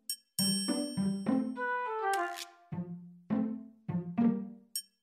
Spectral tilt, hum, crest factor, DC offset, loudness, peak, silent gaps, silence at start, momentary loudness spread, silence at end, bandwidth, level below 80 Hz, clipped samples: -4 dB/octave; none; 16 dB; under 0.1%; -34 LUFS; -18 dBFS; none; 0.1 s; 12 LU; 0.2 s; 16 kHz; -74 dBFS; under 0.1%